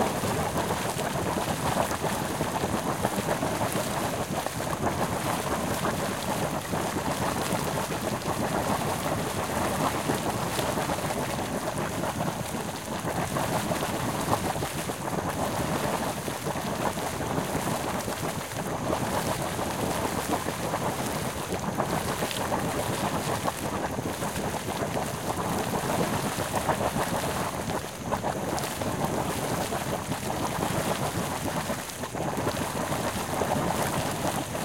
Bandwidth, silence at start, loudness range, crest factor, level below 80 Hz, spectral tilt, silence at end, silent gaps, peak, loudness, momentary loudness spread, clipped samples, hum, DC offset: 17 kHz; 0 s; 1 LU; 20 dB; -50 dBFS; -4.5 dB/octave; 0 s; none; -8 dBFS; -29 LUFS; 3 LU; under 0.1%; none; 0.1%